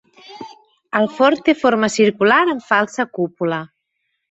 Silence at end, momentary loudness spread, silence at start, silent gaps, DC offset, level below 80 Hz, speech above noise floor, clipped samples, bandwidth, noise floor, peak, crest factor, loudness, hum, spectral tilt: 0.65 s; 19 LU; 0.3 s; none; under 0.1%; -62 dBFS; 56 dB; under 0.1%; 8.2 kHz; -73 dBFS; -2 dBFS; 16 dB; -17 LUFS; none; -4.5 dB/octave